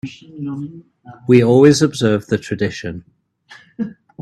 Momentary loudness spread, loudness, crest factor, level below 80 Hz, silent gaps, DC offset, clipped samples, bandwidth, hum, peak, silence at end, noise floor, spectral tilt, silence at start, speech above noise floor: 20 LU; -15 LUFS; 16 dB; -52 dBFS; none; under 0.1%; under 0.1%; 12.5 kHz; none; 0 dBFS; 0 s; -46 dBFS; -6 dB/octave; 0.05 s; 30 dB